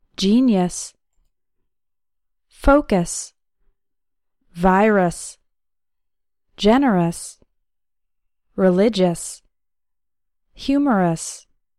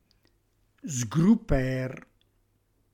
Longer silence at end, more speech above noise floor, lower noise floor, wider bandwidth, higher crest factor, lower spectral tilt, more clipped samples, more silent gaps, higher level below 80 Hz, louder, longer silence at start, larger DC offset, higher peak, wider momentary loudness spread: second, 0.4 s vs 0.95 s; first, 67 dB vs 44 dB; first, -85 dBFS vs -70 dBFS; about the same, 14 kHz vs 15 kHz; about the same, 18 dB vs 18 dB; about the same, -5.5 dB/octave vs -6.5 dB/octave; neither; neither; about the same, -38 dBFS vs -42 dBFS; first, -18 LUFS vs -27 LUFS; second, 0.2 s vs 0.85 s; neither; first, -2 dBFS vs -10 dBFS; about the same, 18 LU vs 19 LU